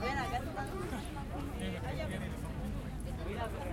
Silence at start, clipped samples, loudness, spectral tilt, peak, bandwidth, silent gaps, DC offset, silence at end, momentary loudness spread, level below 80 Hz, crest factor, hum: 0 s; under 0.1%; -40 LUFS; -6 dB/octave; -24 dBFS; 16.5 kHz; none; under 0.1%; 0 s; 4 LU; -44 dBFS; 14 dB; none